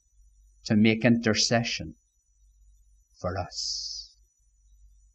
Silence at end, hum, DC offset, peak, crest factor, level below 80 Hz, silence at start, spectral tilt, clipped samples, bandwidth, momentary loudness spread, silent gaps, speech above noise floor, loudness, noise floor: 1.1 s; none; under 0.1%; -6 dBFS; 24 dB; -56 dBFS; 0.65 s; -4 dB/octave; under 0.1%; 8.8 kHz; 16 LU; none; 39 dB; -26 LUFS; -64 dBFS